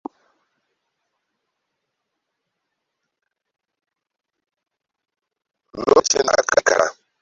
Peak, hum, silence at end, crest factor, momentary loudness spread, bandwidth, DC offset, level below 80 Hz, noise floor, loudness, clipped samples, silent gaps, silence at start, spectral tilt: -2 dBFS; none; 0.3 s; 24 dB; 8 LU; 8 kHz; under 0.1%; -62 dBFS; -82 dBFS; -17 LUFS; under 0.1%; none; 5.75 s; -1.5 dB/octave